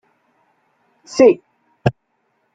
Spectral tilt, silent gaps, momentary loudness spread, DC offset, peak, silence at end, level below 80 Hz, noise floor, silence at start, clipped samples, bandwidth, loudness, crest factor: -6.5 dB/octave; none; 12 LU; under 0.1%; 0 dBFS; 0.65 s; -54 dBFS; -67 dBFS; 1.15 s; under 0.1%; 9 kHz; -17 LUFS; 20 dB